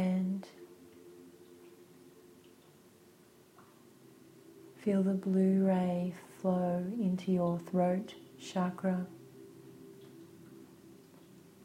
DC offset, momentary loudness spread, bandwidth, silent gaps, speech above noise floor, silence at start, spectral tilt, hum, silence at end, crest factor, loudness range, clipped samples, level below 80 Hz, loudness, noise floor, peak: under 0.1%; 26 LU; 11.5 kHz; none; 29 dB; 0 s; -8.5 dB/octave; none; 0.7 s; 18 dB; 9 LU; under 0.1%; -76 dBFS; -33 LUFS; -61 dBFS; -18 dBFS